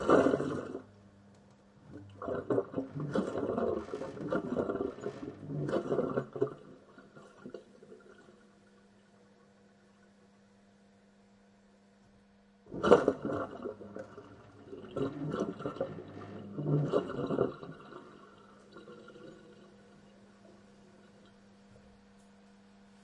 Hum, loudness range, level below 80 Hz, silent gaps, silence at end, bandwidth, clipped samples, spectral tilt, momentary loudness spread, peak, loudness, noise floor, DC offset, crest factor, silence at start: none; 22 LU; -68 dBFS; none; 1.15 s; 10.5 kHz; under 0.1%; -7.5 dB/octave; 25 LU; -8 dBFS; -34 LUFS; -63 dBFS; under 0.1%; 30 dB; 0 s